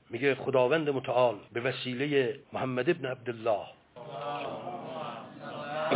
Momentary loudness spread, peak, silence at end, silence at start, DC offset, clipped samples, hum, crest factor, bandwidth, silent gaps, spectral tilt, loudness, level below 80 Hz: 14 LU; -12 dBFS; 0 s; 0.1 s; under 0.1%; under 0.1%; none; 18 dB; 4 kHz; none; -9.5 dB/octave; -31 LUFS; -74 dBFS